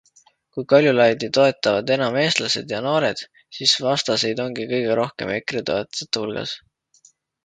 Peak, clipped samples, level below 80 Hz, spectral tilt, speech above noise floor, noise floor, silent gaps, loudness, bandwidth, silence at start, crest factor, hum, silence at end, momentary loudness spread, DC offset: 0 dBFS; under 0.1%; -62 dBFS; -4 dB/octave; 37 dB; -58 dBFS; none; -20 LUFS; 9.4 kHz; 0.55 s; 20 dB; none; 0.9 s; 12 LU; under 0.1%